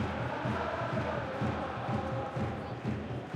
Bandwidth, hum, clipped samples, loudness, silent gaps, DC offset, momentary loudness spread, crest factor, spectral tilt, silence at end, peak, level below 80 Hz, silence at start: 10 kHz; none; under 0.1%; -35 LUFS; none; under 0.1%; 3 LU; 14 dB; -7.5 dB/octave; 0 s; -20 dBFS; -56 dBFS; 0 s